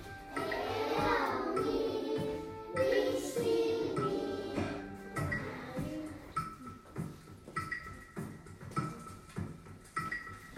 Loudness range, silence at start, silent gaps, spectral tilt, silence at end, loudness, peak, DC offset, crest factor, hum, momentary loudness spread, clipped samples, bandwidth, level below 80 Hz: 9 LU; 0 s; none; -5.5 dB/octave; 0 s; -37 LUFS; -18 dBFS; under 0.1%; 18 dB; none; 14 LU; under 0.1%; 16 kHz; -58 dBFS